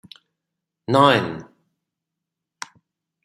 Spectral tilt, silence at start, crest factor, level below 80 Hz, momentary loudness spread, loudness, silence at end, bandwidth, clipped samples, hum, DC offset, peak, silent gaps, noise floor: -5.5 dB/octave; 0.9 s; 22 dB; -66 dBFS; 23 LU; -18 LUFS; 1.8 s; 14 kHz; under 0.1%; none; under 0.1%; -2 dBFS; none; -84 dBFS